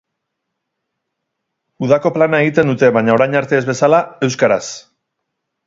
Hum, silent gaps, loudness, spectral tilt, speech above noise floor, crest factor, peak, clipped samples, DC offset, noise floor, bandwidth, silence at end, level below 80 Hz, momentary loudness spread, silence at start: none; none; -14 LUFS; -6 dB/octave; 62 dB; 16 dB; 0 dBFS; under 0.1%; under 0.1%; -76 dBFS; 7.8 kHz; 0.9 s; -58 dBFS; 7 LU; 1.8 s